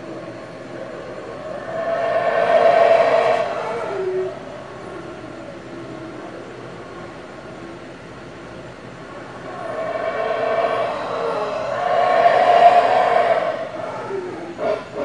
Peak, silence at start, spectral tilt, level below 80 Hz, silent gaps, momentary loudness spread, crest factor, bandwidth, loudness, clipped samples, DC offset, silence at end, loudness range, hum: 0 dBFS; 0 s; -5 dB/octave; -56 dBFS; none; 21 LU; 20 dB; 10 kHz; -18 LUFS; under 0.1%; 0.2%; 0 s; 18 LU; none